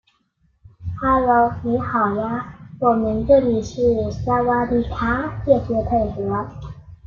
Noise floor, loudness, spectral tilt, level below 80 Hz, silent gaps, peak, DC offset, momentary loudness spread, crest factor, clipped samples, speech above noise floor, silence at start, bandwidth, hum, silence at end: -64 dBFS; -20 LUFS; -8 dB/octave; -38 dBFS; none; -2 dBFS; under 0.1%; 12 LU; 18 dB; under 0.1%; 45 dB; 0.8 s; 7.2 kHz; none; 0.1 s